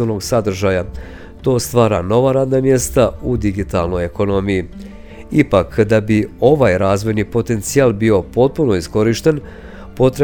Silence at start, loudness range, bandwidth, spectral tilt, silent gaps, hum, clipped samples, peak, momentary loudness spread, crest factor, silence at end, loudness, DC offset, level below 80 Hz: 0 s; 3 LU; over 20 kHz; -6 dB/octave; none; none; under 0.1%; 0 dBFS; 10 LU; 16 dB; 0 s; -15 LUFS; under 0.1%; -34 dBFS